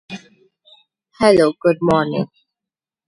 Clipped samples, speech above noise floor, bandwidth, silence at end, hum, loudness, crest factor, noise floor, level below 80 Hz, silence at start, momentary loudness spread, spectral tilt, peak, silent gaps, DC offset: under 0.1%; 73 dB; 11.5 kHz; 0.85 s; none; -16 LUFS; 18 dB; -88 dBFS; -54 dBFS; 0.1 s; 19 LU; -6.5 dB/octave; 0 dBFS; none; under 0.1%